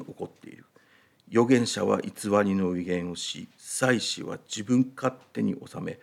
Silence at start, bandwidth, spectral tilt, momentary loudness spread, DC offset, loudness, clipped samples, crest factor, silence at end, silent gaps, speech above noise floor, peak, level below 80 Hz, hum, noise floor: 0 s; 14.5 kHz; -5 dB/octave; 13 LU; under 0.1%; -27 LUFS; under 0.1%; 20 dB; 0.05 s; none; 35 dB; -8 dBFS; -74 dBFS; none; -61 dBFS